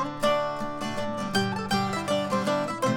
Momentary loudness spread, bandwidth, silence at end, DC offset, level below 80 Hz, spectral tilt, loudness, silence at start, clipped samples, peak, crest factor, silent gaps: 6 LU; 18.5 kHz; 0 s; under 0.1%; -52 dBFS; -5 dB/octave; -27 LUFS; 0 s; under 0.1%; -10 dBFS; 16 dB; none